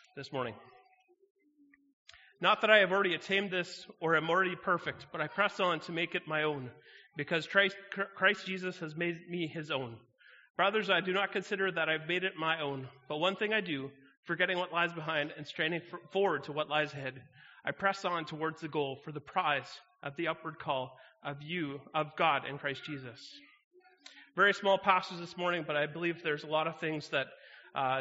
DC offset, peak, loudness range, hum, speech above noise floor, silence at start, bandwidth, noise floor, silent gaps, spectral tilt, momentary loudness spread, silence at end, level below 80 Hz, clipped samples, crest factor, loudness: under 0.1%; -8 dBFS; 6 LU; none; 33 dB; 0.15 s; 7.6 kHz; -67 dBFS; 1.30-1.35 s, 1.93-2.05 s, 10.50-10.55 s, 14.17-14.23 s, 23.64-23.71 s; -2 dB/octave; 14 LU; 0 s; -78 dBFS; under 0.1%; 26 dB; -33 LUFS